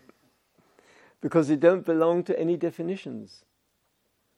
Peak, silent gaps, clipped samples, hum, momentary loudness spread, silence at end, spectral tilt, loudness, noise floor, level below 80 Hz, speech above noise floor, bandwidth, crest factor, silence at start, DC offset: -8 dBFS; none; under 0.1%; none; 15 LU; 1.1 s; -7.5 dB/octave; -25 LUFS; -73 dBFS; -80 dBFS; 49 dB; 10.5 kHz; 20 dB; 1.25 s; under 0.1%